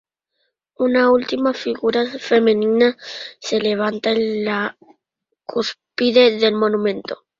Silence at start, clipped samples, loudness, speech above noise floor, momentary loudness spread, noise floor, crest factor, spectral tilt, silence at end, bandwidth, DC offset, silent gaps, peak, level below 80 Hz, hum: 0.8 s; under 0.1%; -18 LUFS; 59 dB; 12 LU; -77 dBFS; 18 dB; -5 dB/octave; 0.25 s; 7.6 kHz; under 0.1%; none; -2 dBFS; -62 dBFS; none